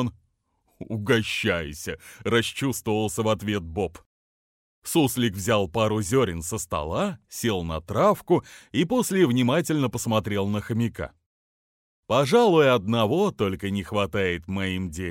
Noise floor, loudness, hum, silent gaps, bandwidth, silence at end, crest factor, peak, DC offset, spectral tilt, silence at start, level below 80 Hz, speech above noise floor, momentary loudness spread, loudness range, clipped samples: -70 dBFS; -24 LUFS; none; 4.06-4.82 s, 11.26-12.03 s; 16.5 kHz; 0 s; 18 dB; -6 dBFS; under 0.1%; -5 dB/octave; 0 s; -50 dBFS; 46 dB; 10 LU; 4 LU; under 0.1%